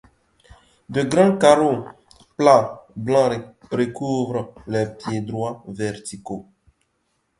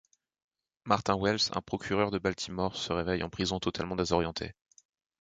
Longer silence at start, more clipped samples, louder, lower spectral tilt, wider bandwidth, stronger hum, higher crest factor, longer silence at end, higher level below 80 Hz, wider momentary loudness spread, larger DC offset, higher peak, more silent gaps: about the same, 0.9 s vs 0.85 s; neither; first, -20 LUFS vs -31 LUFS; first, -6 dB/octave vs -4.5 dB/octave; first, 11.5 kHz vs 9.4 kHz; neither; about the same, 22 dB vs 24 dB; first, 0.95 s vs 0.7 s; about the same, -56 dBFS vs -52 dBFS; first, 17 LU vs 7 LU; neither; first, 0 dBFS vs -10 dBFS; neither